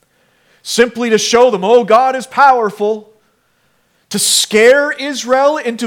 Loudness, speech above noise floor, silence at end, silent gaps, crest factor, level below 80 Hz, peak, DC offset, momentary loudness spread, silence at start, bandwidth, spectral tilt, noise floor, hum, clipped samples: -11 LUFS; 47 dB; 0 s; none; 12 dB; -56 dBFS; 0 dBFS; under 0.1%; 10 LU; 0.65 s; 18 kHz; -2 dB/octave; -58 dBFS; none; 0.1%